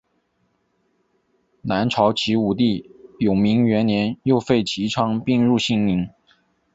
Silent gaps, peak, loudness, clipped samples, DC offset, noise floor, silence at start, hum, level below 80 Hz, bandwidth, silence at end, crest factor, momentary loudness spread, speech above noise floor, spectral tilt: none; -4 dBFS; -20 LUFS; under 0.1%; under 0.1%; -68 dBFS; 1.65 s; none; -52 dBFS; 8 kHz; 0.65 s; 18 dB; 7 LU; 49 dB; -6.5 dB/octave